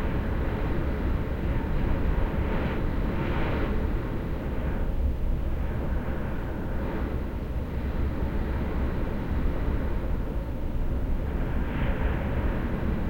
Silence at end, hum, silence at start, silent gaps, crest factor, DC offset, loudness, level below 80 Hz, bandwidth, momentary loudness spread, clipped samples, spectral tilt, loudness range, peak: 0 s; none; 0 s; none; 12 dB; under 0.1%; -30 LUFS; -28 dBFS; 16.5 kHz; 4 LU; under 0.1%; -8.5 dB/octave; 2 LU; -14 dBFS